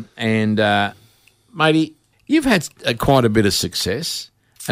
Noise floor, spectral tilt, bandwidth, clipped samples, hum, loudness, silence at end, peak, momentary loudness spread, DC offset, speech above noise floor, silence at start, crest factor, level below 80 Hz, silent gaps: -54 dBFS; -4.5 dB/octave; 16 kHz; under 0.1%; none; -18 LUFS; 0 s; -2 dBFS; 10 LU; under 0.1%; 37 dB; 0 s; 18 dB; -44 dBFS; none